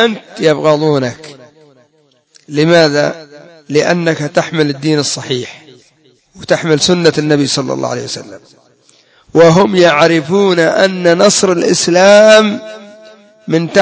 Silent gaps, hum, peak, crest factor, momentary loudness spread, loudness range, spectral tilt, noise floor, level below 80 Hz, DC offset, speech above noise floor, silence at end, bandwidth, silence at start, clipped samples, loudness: none; none; 0 dBFS; 12 dB; 14 LU; 6 LU; -4.5 dB/octave; -54 dBFS; -54 dBFS; under 0.1%; 43 dB; 0 s; 8 kHz; 0 s; 0.4%; -10 LUFS